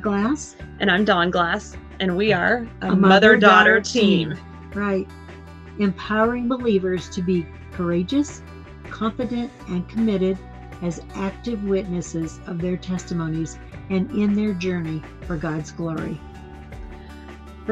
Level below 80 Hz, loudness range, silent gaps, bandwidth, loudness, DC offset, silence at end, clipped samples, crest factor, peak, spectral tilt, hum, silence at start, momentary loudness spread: -42 dBFS; 10 LU; none; 8.6 kHz; -21 LUFS; under 0.1%; 0 s; under 0.1%; 22 dB; 0 dBFS; -5.5 dB/octave; none; 0 s; 22 LU